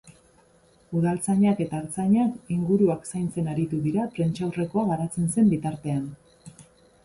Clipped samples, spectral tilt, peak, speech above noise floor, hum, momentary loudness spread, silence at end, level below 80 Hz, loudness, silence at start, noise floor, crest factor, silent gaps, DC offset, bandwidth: under 0.1%; -7.5 dB/octave; -10 dBFS; 35 dB; none; 8 LU; 0.4 s; -58 dBFS; -25 LUFS; 0.05 s; -59 dBFS; 16 dB; none; under 0.1%; 11.5 kHz